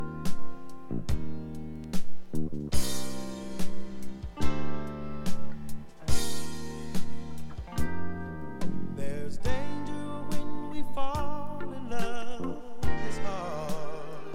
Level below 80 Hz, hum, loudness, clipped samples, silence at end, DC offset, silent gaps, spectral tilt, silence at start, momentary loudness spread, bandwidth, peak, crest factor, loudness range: -40 dBFS; none; -37 LUFS; under 0.1%; 0 s; under 0.1%; none; -5 dB/octave; 0 s; 8 LU; 15 kHz; -8 dBFS; 14 dB; 1 LU